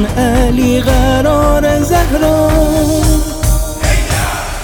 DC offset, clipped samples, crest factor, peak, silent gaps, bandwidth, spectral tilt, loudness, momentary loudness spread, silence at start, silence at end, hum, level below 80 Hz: under 0.1%; under 0.1%; 10 dB; 0 dBFS; none; over 20 kHz; -5.5 dB/octave; -12 LUFS; 4 LU; 0 s; 0 s; none; -16 dBFS